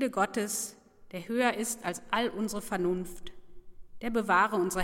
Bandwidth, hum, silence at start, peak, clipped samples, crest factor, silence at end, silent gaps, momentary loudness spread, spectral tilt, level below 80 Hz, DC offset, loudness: 16.5 kHz; none; 0 s; -12 dBFS; under 0.1%; 18 dB; 0 s; none; 17 LU; -3.5 dB/octave; -56 dBFS; under 0.1%; -30 LUFS